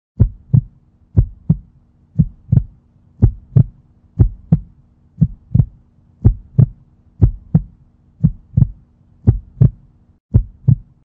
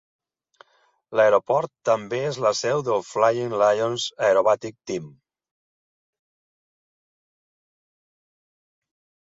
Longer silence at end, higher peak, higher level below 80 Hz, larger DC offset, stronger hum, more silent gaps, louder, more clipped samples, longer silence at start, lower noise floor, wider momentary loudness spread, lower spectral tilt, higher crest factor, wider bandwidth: second, 0.25 s vs 4.25 s; first, 0 dBFS vs -4 dBFS; first, -26 dBFS vs -70 dBFS; neither; neither; first, 10.20-10.29 s vs none; first, -18 LUFS vs -22 LUFS; neither; second, 0.2 s vs 1.1 s; second, -50 dBFS vs -65 dBFS; second, 4 LU vs 9 LU; first, -14 dB/octave vs -4 dB/octave; about the same, 16 dB vs 20 dB; second, 1.8 kHz vs 7.8 kHz